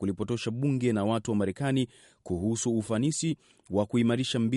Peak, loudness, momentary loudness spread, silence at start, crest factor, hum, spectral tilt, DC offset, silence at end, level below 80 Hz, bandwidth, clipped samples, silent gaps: -12 dBFS; -29 LUFS; 6 LU; 0 s; 16 dB; none; -5.5 dB/octave; under 0.1%; 0 s; -60 dBFS; 11.5 kHz; under 0.1%; none